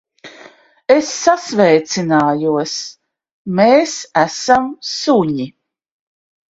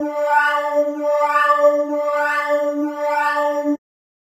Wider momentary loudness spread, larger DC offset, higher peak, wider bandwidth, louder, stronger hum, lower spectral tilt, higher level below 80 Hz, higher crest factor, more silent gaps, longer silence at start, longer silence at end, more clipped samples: first, 12 LU vs 7 LU; neither; first, 0 dBFS vs -4 dBFS; second, 8 kHz vs 15 kHz; first, -15 LUFS vs -18 LUFS; neither; first, -4.5 dB/octave vs -2 dB/octave; first, -58 dBFS vs under -90 dBFS; about the same, 16 dB vs 16 dB; first, 3.31-3.45 s vs none; first, 0.25 s vs 0 s; first, 1 s vs 0.45 s; neither